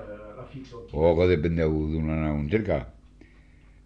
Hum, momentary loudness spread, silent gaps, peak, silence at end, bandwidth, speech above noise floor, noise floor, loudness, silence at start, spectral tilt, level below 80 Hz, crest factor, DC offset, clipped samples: none; 20 LU; none; -8 dBFS; 0.95 s; 6.6 kHz; 28 dB; -53 dBFS; -25 LUFS; 0 s; -9.5 dB/octave; -38 dBFS; 18 dB; under 0.1%; under 0.1%